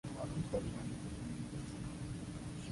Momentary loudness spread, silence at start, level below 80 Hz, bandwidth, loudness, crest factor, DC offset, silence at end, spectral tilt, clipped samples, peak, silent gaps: 6 LU; 0.05 s; -54 dBFS; 11.5 kHz; -44 LUFS; 16 dB; under 0.1%; 0 s; -6.5 dB/octave; under 0.1%; -26 dBFS; none